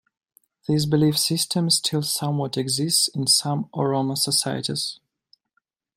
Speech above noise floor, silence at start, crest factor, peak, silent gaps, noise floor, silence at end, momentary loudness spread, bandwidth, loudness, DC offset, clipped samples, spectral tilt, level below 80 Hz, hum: 51 dB; 0.7 s; 18 dB; -6 dBFS; none; -73 dBFS; 1 s; 7 LU; 16 kHz; -21 LUFS; under 0.1%; under 0.1%; -4 dB/octave; -62 dBFS; none